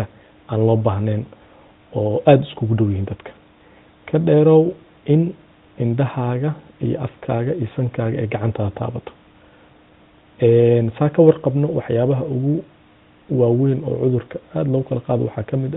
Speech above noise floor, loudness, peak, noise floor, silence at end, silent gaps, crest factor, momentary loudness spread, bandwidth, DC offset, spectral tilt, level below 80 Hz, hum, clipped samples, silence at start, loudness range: 33 dB; -19 LUFS; 0 dBFS; -51 dBFS; 0 s; none; 18 dB; 12 LU; 4 kHz; under 0.1%; -8.5 dB/octave; -52 dBFS; none; under 0.1%; 0 s; 6 LU